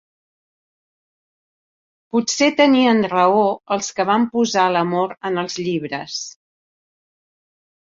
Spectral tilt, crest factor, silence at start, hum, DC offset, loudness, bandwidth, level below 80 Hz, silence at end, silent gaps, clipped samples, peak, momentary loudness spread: -4 dB/octave; 18 dB; 2.15 s; none; under 0.1%; -18 LUFS; 7.8 kHz; -66 dBFS; 1.6 s; none; under 0.1%; -2 dBFS; 11 LU